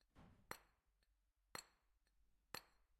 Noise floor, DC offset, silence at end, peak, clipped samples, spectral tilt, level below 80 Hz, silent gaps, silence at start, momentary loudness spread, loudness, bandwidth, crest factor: -84 dBFS; under 0.1%; 0.05 s; -30 dBFS; under 0.1%; -2 dB/octave; -80 dBFS; none; 0.15 s; 2 LU; -58 LUFS; 16.5 kHz; 34 dB